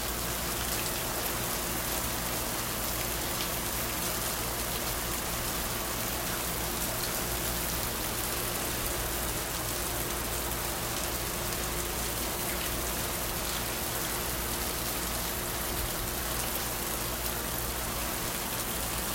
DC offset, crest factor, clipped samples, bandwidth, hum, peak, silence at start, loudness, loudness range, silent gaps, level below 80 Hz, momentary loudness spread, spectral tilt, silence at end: under 0.1%; 18 dB; under 0.1%; 16.5 kHz; none; -14 dBFS; 0 s; -31 LUFS; 1 LU; none; -42 dBFS; 1 LU; -2.5 dB/octave; 0 s